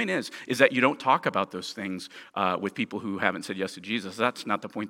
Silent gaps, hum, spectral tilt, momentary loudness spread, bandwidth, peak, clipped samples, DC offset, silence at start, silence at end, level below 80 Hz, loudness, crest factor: none; none; -4.5 dB/octave; 11 LU; 17 kHz; -4 dBFS; under 0.1%; under 0.1%; 0 s; 0 s; -76 dBFS; -27 LUFS; 24 dB